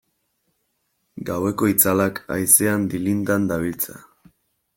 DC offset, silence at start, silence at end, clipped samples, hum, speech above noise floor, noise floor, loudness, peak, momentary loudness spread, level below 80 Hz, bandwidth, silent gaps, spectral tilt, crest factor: under 0.1%; 1.15 s; 0.75 s; under 0.1%; none; 51 dB; -72 dBFS; -19 LUFS; -2 dBFS; 13 LU; -56 dBFS; 17 kHz; none; -4.5 dB/octave; 22 dB